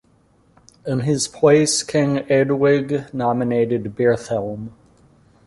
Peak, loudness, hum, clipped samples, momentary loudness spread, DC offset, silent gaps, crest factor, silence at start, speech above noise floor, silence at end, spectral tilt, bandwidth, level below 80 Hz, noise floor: -2 dBFS; -19 LUFS; none; under 0.1%; 11 LU; under 0.1%; none; 18 dB; 0.85 s; 39 dB; 0.75 s; -5 dB/octave; 11.5 kHz; -54 dBFS; -57 dBFS